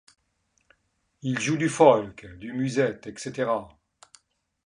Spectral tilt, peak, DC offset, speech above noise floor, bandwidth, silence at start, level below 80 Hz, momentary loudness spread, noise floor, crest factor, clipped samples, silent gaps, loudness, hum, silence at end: -5.5 dB/octave; -2 dBFS; under 0.1%; 48 dB; 11 kHz; 1.25 s; -62 dBFS; 17 LU; -73 dBFS; 24 dB; under 0.1%; none; -25 LUFS; none; 1 s